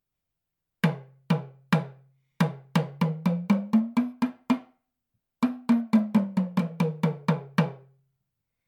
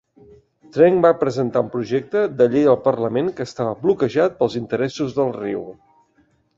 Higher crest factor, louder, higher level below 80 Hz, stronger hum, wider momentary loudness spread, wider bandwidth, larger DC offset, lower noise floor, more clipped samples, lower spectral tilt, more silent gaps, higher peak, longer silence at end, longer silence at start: about the same, 20 dB vs 18 dB; second, -27 LUFS vs -19 LUFS; second, -74 dBFS vs -58 dBFS; neither; second, 6 LU vs 10 LU; first, 15.5 kHz vs 7.6 kHz; neither; first, -85 dBFS vs -61 dBFS; neither; about the same, -8 dB/octave vs -7 dB/octave; neither; second, -8 dBFS vs -2 dBFS; about the same, 0.9 s vs 0.85 s; about the same, 0.85 s vs 0.75 s